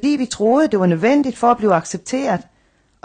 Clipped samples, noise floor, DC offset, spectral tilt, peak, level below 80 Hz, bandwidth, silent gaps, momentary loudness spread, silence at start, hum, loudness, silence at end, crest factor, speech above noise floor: under 0.1%; -59 dBFS; under 0.1%; -6 dB/octave; -2 dBFS; -54 dBFS; 9.8 kHz; none; 7 LU; 0 s; none; -17 LUFS; 0.65 s; 14 dB; 42 dB